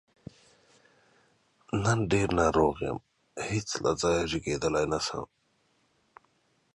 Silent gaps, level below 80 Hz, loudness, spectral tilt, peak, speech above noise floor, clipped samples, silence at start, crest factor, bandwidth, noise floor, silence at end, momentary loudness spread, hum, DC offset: none; -50 dBFS; -29 LUFS; -5 dB/octave; -10 dBFS; 43 dB; under 0.1%; 1.75 s; 20 dB; 11.5 kHz; -71 dBFS; 1.5 s; 14 LU; none; under 0.1%